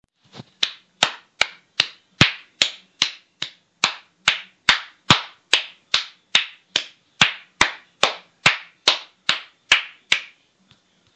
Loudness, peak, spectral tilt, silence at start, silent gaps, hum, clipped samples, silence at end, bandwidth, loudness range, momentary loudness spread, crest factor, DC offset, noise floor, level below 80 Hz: -21 LUFS; 0 dBFS; -1.5 dB/octave; 0.35 s; none; none; under 0.1%; 0.9 s; 11.5 kHz; 2 LU; 7 LU; 24 dB; under 0.1%; -59 dBFS; -54 dBFS